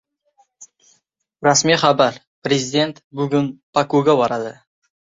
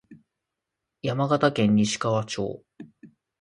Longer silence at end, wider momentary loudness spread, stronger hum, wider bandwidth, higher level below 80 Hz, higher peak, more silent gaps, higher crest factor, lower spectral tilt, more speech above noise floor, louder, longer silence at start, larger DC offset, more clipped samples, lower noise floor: first, 0.6 s vs 0.35 s; about the same, 11 LU vs 12 LU; neither; second, 8 kHz vs 11.5 kHz; about the same, -62 dBFS vs -62 dBFS; first, -2 dBFS vs -6 dBFS; first, 2.27-2.42 s, 3.04-3.11 s, 3.63-3.73 s vs none; about the same, 18 dB vs 20 dB; second, -4 dB/octave vs -5.5 dB/octave; second, 48 dB vs 61 dB; first, -18 LUFS vs -24 LUFS; first, 0.6 s vs 0.1 s; neither; neither; second, -65 dBFS vs -84 dBFS